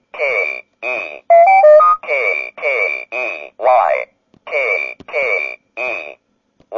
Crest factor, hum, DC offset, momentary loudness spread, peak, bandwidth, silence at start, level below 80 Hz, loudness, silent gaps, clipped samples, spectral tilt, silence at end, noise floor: 14 dB; none; under 0.1%; 15 LU; -2 dBFS; 7.2 kHz; 0.15 s; -68 dBFS; -14 LUFS; none; under 0.1%; -3 dB/octave; 0 s; -58 dBFS